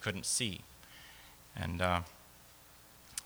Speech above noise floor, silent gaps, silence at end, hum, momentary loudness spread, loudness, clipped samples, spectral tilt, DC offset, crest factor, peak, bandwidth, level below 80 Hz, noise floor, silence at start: 23 dB; none; 0 s; 60 Hz at -60 dBFS; 23 LU; -36 LUFS; under 0.1%; -3 dB/octave; under 0.1%; 24 dB; -16 dBFS; over 20 kHz; -58 dBFS; -59 dBFS; 0 s